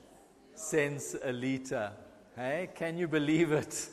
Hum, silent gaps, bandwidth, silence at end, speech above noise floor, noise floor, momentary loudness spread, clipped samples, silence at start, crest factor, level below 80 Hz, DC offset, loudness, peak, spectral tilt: none; none; 13 kHz; 0 s; 26 dB; -59 dBFS; 12 LU; under 0.1%; 0.1 s; 18 dB; -68 dBFS; under 0.1%; -33 LUFS; -16 dBFS; -5 dB/octave